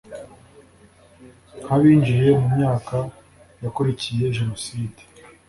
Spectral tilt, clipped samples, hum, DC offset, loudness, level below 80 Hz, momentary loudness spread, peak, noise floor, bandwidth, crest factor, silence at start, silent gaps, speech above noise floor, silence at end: -7.5 dB/octave; under 0.1%; none; under 0.1%; -20 LUFS; -50 dBFS; 18 LU; -4 dBFS; -51 dBFS; 11.5 kHz; 16 dB; 0.1 s; none; 32 dB; 0.55 s